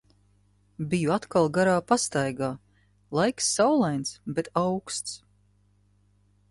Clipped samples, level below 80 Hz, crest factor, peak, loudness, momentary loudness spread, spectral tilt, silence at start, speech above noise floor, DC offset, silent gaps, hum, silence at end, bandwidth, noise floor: under 0.1%; -62 dBFS; 20 dB; -8 dBFS; -26 LUFS; 10 LU; -4.5 dB/octave; 0.8 s; 38 dB; under 0.1%; none; 50 Hz at -55 dBFS; 1.35 s; 11.5 kHz; -64 dBFS